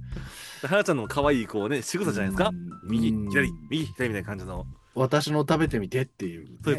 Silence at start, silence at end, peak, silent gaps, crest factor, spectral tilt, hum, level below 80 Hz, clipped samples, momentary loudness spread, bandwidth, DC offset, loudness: 0 s; 0 s; -8 dBFS; none; 20 dB; -5.5 dB/octave; none; -46 dBFS; under 0.1%; 13 LU; 12.5 kHz; under 0.1%; -27 LUFS